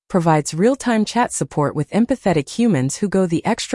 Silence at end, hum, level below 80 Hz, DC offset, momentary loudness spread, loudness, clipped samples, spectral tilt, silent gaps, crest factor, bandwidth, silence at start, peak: 0 s; none; -50 dBFS; under 0.1%; 4 LU; -18 LUFS; under 0.1%; -5.5 dB/octave; none; 14 dB; 12 kHz; 0.1 s; -4 dBFS